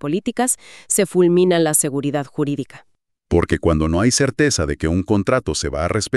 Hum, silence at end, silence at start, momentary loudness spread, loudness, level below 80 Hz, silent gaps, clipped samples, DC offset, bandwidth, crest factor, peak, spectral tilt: none; 0 s; 0.05 s; 8 LU; -18 LUFS; -36 dBFS; none; under 0.1%; under 0.1%; 14 kHz; 16 dB; -2 dBFS; -4.5 dB/octave